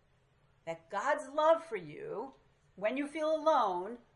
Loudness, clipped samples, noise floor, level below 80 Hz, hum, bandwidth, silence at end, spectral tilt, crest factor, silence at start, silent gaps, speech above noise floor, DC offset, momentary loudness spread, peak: -33 LUFS; under 0.1%; -70 dBFS; -76 dBFS; none; 11 kHz; 0.2 s; -4.5 dB/octave; 18 dB; 0.65 s; none; 36 dB; under 0.1%; 16 LU; -16 dBFS